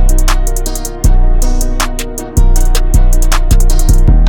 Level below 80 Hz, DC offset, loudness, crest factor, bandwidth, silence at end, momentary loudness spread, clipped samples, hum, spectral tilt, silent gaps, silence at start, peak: -8 dBFS; under 0.1%; -14 LUFS; 6 dB; 17 kHz; 0 s; 5 LU; under 0.1%; none; -4.5 dB/octave; none; 0 s; 0 dBFS